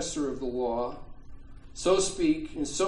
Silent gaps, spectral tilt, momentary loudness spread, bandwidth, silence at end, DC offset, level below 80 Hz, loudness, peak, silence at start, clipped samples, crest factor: none; -3.5 dB/octave; 11 LU; 10.5 kHz; 0 s; under 0.1%; -46 dBFS; -29 LUFS; -12 dBFS; 0 s; under 0.1%; 16 dB